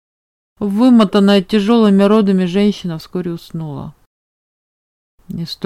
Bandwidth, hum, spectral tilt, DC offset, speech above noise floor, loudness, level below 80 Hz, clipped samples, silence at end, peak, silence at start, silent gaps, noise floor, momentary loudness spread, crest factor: 13 kHz; none; -7.5 dB/octave; under 0.1%; over 77 dB; -13 LUFS; -50 dBFS; under 0.1%; 0 s; 0 dBFS; 0.6 s; 4.06-5.18 s; under -90 dBFS; 17 LU; 14 dB